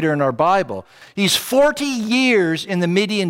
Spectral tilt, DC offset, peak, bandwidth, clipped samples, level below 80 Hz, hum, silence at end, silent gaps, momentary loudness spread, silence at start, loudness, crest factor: -4.5 dB/octave; under 0.1%; -4 dBFS; 16.5 kHz; under 0.1%; -56 dBFS; none; 0 s; none; 8 LU; 0 s; -17 LUFS; 14 dB